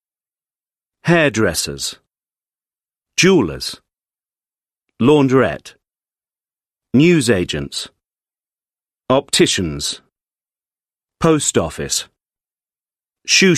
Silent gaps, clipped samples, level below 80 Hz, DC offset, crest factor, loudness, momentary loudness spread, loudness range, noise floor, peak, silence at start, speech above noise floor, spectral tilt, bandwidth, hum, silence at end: none; under 0.1%; -46 dBFS; under 0.1%; 18 dB; -16 LUFS; 14 LU; 4 LU; under -90 dBFS; 0 dBFS; 1.05 s; over 75 dB; -4 dB/octave; 13.5 kHz; none; 0 s